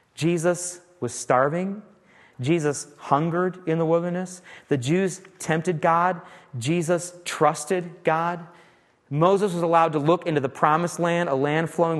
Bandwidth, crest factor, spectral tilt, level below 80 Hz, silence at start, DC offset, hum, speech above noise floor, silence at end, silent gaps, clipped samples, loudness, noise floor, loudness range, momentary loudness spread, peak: 12.5 kHz; 20 dB; -5.5 dB/octave; -68 dBFS; 0.2 s; under 0.1%; none; 34 dB; 0 s; none; under 0.1%; -24 LUFS; -57 dBFS; 3 LU; 11 LU; -4 dBFS